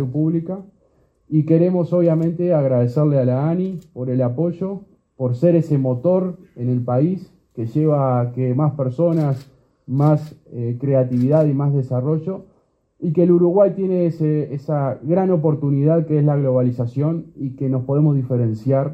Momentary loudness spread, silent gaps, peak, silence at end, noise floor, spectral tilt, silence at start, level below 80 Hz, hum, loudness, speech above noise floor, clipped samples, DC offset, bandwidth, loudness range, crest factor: 11 LU; none; -2 dBFS; 0 s; -59 dBFS; -11.5 dB/octave; 0 s; -60 dBFS; none; -19 LUFS; 41 dB; under 0.1%; under 0.1%; 5.2 kHz; 2 LU; 16 dB